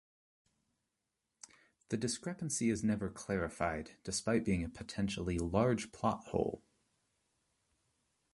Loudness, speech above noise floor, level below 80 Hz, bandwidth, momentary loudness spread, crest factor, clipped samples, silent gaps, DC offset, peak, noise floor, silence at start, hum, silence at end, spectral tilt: -37 LUFS; 51 dB; -56 dBFS; 11.5 kHz; 9 LU; 22 dB; under 0.1%; none; under 0.1%; -16 dBFS; -87 dBFS; 1.9 s; none; 1.75 s; -5 dB/octave